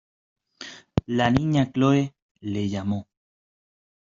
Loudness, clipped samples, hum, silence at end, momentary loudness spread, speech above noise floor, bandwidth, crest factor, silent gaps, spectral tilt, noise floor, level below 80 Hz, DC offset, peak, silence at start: -24 LUFS; under 0.1%; none; 1.05 s; 18 LU; 22 dB; 7.6 kHz; 22 dB; 2.22-2.35 s; -7 dB/octave; -44 dBFS; -50 dBFS; under 0.1%; -4 dBFS; 0.6 s